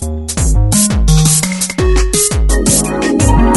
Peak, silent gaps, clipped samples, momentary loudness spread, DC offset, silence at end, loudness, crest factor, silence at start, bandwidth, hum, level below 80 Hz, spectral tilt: 0 dBFS; none; under 0.1%; 4 LU; under 0.1%; 0 s; -11 LUFS; 10 dB; 0 s; 12 kHz; none; -14 dBFS; -4 dB/octave